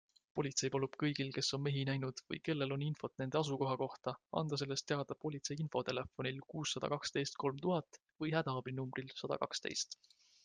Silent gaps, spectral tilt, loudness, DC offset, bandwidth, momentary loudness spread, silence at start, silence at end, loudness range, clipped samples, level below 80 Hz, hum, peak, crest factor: none; -4.5 dB/octave; -40 LUFS; under 0.1%; 10 kHz; 6 LU; 0.35 s; 0.5 s; 2 LU; under 0.1%; -74 dBFS; none; -20 dBFS; 20 dB